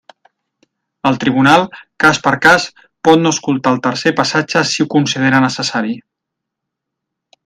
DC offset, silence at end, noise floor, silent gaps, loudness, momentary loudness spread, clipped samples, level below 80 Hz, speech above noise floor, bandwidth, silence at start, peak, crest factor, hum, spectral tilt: under 0.1%; 1.45 s; -79 dBFS; none; -13 LUFS; 9 LU; under 0.1%; -54 dBFS; 66 dB; 14.5 kHz; 1.05 s; 0 dBFS; 14 dB; none; -4.5 dB/octave